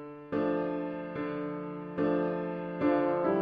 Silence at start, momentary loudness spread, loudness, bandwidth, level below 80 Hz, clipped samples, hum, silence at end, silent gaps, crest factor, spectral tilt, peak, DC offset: 0 s; 9 LU; -32 LUFS; 5.2 kHz; -66 dBFS; under 0.1%; none; 0 s; none; 16 dB; -10 dB/octave; -16 dBFS; under 0.1%